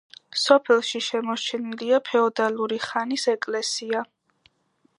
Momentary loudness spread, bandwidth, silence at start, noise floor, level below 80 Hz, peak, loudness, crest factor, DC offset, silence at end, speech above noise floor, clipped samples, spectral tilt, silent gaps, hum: 10 LU; 11 kHz; 0.35 s; -67 dBFS; -80 dBFS; -2 dBFS; -23 LUFS; 22 dB; under 0.1%; 0.95 s; 44 dB; under 0.1%; -2.5 dB/octave; none; none